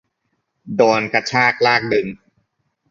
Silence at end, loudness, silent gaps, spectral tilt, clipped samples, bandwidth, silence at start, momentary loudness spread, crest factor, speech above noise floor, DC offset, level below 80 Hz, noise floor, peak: 0.75 s; -16 LUFS; none; -4.5 dB/octave; under 0.1%; 7.6 kHz; 0.65 s; 9 LU; 18 dB; 55 dB; under 0.1%; -58 dBFS; -71 dBFS; 0 dBFS